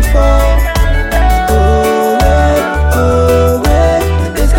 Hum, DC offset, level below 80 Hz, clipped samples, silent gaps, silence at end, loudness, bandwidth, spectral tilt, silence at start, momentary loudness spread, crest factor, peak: none; under 0.1%; -12 dBFS; under 0.1%; none; 0 s; -11 LUFS; 17 kHz; -6 dB/octave; 0 s; 3 LU; 8 dB; 0 dBFS